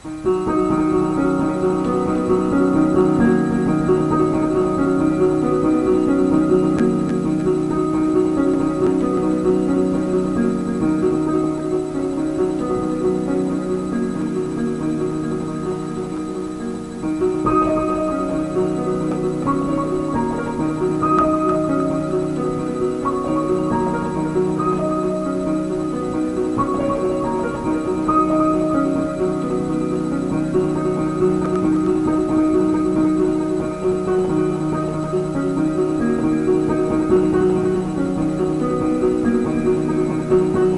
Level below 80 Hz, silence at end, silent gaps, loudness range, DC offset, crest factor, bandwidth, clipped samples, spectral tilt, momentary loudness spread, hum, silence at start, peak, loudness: -40 dBFS; 0 s; none; 4 LU; under 0.1%; 14 dB; 11.5 kHz; under 0.1%; -8 dB/octave; 5 LU; none; 0 s; -4 dBFS; -19 LUFS